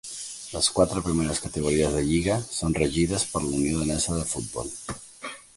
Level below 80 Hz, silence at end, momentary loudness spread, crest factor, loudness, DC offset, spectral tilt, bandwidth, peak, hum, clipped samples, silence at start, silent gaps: -42 dBFS; 0.15 s; 11 LU; 20 dB; -25 LUFS; under 0.1%; -4.5 dB/octave; 11.5 kHz; -6 dBFS; none; under 0.1%; 0.05 s; none